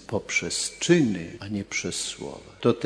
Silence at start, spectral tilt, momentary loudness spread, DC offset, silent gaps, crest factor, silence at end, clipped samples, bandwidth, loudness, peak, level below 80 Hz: 0 s; -4 dB/octave; 12 LU; under 0.1%; none; 20 dB; 0 s; under 0.1%; 11 kHz; -26 LUFS; -6 dBFS; -58 dBFS